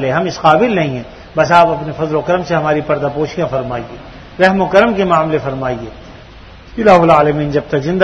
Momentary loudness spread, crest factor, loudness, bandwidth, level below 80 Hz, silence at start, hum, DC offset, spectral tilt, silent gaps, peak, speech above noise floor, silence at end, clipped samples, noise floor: 15 LU; 14 dB; -13 LUFS; 8.8 kHz; -40 dBFS; 0 s; none; under 0.1%; -6.5 dB/octave; none; 0 dBFS; 23 dB; 0 s; 0.3%; -36 dBFS